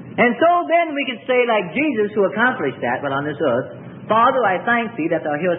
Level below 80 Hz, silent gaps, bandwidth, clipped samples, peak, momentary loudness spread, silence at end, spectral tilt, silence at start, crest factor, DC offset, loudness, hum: -64 dBFS; none; 3.9 kHz; under 0.1%; -2 dBFS; 7 LU; 0 s; -10.5 dB/octave; 0 s; 16 dB; under 0.1%; -18 LUFS; none